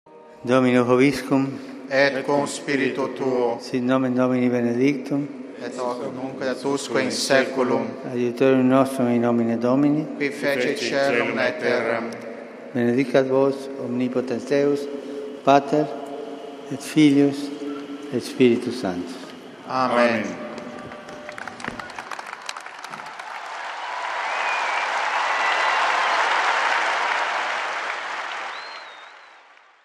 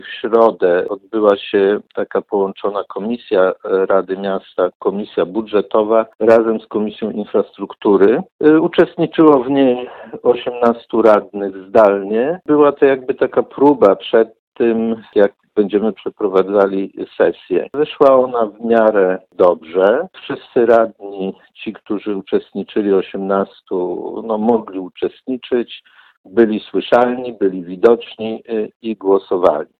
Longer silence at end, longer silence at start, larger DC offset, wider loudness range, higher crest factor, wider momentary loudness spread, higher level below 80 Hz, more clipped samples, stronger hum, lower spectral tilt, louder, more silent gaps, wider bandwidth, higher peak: first, 0.6 s vs 0.15 s; about the same, 0.1 s vs 0.05 s; neither; about the same, 6 LU vs 5 LU; about the same, 20 dB vs 16 dB; first, 15 LU vs 11 LU; second, -68 dBFS vs -58 dBFS; neither; neither; second, -5 dB/octave vs -8 dB/octave; second, -22 LUFS vs -16 LUFS; second, none vs 4.75-4.80 s, 6.15-6.19 s, 8.32-8.39 s, 14.39-14.52 s, 26.17-26.24 s, 28.76-28.80 s; first, 13.5 kHz vs 5.4 kHz; about the same, -2 dBFS vs 0 dBFS